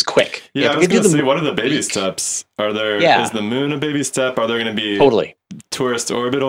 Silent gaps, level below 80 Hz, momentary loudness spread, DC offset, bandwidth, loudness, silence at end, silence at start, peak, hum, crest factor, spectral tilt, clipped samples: none; -56 dBFS; 7 LU; under 0.1%; 16.5 kHz; -17 LUFS; 0 s; 0 s; 0 dBFS; none; 16 dB; -3.5 dB/octave; under 0.1%